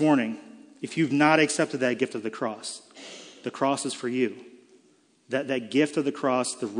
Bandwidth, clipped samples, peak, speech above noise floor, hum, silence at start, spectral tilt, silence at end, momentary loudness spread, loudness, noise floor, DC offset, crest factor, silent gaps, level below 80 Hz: 10.5 kHz; under 0.1%; -6 dBFS; 37 dB; none; 0 s; -4.5 dB/octave; 0 s; 19 LU; -26 LUFS; -62 dBFS; under 0.1%; 22 dB; none; -82 dBFS